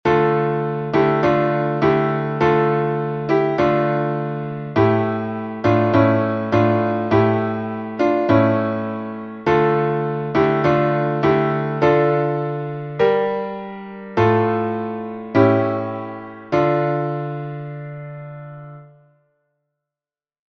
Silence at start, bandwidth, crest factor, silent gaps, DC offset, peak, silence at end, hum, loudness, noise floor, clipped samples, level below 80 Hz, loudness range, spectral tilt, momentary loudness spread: 0.05 s; 6.6 kHz; 18 dB; none; under 0.1%; -2 dBFS; 1.7 s; none; -19 LUFS; under -90 dBFS; under 0.1%; -52 dBFS; 6 LU; -9 dB/octave; 13 LU